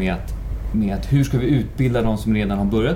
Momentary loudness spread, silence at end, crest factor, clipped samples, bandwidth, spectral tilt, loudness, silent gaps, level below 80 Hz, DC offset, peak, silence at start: 8 LU; 0 s; 12 dB; under 0.1%; 16.5 kHz; -7.5 dB/octave; -21 LUFS; none; -28 dBFS; under 0.1%; -6 dBFS; 0 s